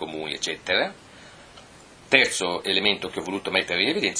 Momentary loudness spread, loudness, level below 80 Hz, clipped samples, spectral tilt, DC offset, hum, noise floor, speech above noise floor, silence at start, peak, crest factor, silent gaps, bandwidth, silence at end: 11 LU; -23 LUFS; -62 dBFS; under 0.1%; -2 dB/octave; under 0.1%; none; -48 dBFS; 24 dB; 0 s; 0 dBFS; 26 dB; none; 14 kHz; 0 s